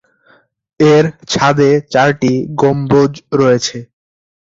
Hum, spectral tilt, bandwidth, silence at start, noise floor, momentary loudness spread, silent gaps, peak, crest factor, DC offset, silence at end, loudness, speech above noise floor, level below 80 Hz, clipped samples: none; -5.5 dB/octave; 7.8 kHz; 0.8 s; -51 dBFS; 5 LU; none; 0 dBFS; 12 dB; under 0.1%; 0.55 s; -12 LUFS; 40 dB; -48 dBFS; under 0.1%